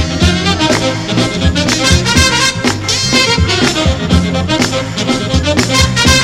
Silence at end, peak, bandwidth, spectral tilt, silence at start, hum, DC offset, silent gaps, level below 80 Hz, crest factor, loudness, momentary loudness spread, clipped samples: 0 s; 0 dBFS; 16 kHz; -3.5 dB/octave; 0 s; none; under 0.1%; none; -22 dBFS; 12 dB; -11 LUFS; 5 LU; under 0.1%